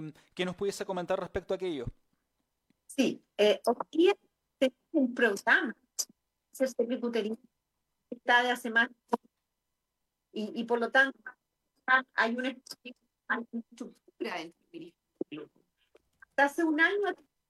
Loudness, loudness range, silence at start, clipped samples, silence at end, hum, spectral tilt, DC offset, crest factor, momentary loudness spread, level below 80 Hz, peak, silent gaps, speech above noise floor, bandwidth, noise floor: -30 LUFS; 8 LU; 0 s; under 0.1%; 0.35 s; none; -3.5 dB/octave; under 0.1%; 20 dB; 19 LU; -64 dBFS; -12 dBFS; none; 54 dB; 13.5 kHz; -85 dBFS